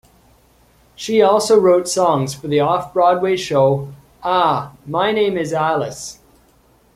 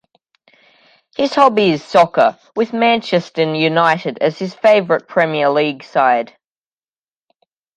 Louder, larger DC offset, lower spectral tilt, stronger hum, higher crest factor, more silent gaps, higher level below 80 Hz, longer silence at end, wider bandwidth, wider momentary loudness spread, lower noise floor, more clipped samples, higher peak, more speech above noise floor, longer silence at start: about the same, -17 LUFS vs -15 LUFS; neither; about the same, -5 dB/octave vs -6 dB/octave; neither; about the same, 16 dB vs 16 dB; neither; first, -54 dBFS vs -64 dBFS; second, 0.8 s vs 1.5 s; first, 15 kHz vs 9.8 kHz; first, 13 LU vs 7 LU; second, -54 dBFS vs under -90 dBFS; neither; about the same, -2 dBFS vs 0 dBFS; second, 38 dB vs over 75 dB; second, 1 s vs 1.2 s